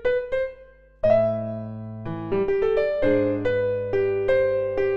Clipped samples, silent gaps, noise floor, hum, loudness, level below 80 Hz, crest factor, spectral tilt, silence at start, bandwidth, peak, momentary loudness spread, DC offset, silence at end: under 0.1%; none; -49 dBFS; none; -23 LUFS; -46 dBFS; 16 dB; -8.5 dB/octave; 0 s; 5.8 kHz; -8 dBFS; 11 LU; under 0.1%; 0 s